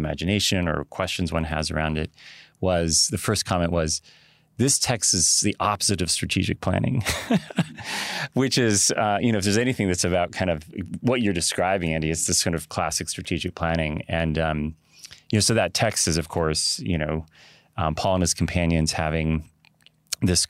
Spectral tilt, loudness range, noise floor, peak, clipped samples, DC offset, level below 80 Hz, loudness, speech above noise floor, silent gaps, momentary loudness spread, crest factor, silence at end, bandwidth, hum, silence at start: -3.5 dB/octave; 3 LU; -58 dBFS; -6 dBFS; under 0.1%; under 0.1%; -42 dBFS; -23 LUFS; 35 dB; none; 8 LU; 18 dB; 0.05 s; 16 kHz; none; 0 s